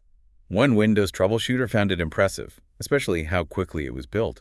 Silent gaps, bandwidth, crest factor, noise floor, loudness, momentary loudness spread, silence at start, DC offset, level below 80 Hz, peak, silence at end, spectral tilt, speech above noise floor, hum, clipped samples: none; 12 kHz; 18 dB; -56 dBFS; -23 LUFS; 10 LU; 0.5 s; under 0.1%; -46 dBFS; -6 dBFS; 0.05 s; -6 dB/octave; 33 dB; none; under 0.1%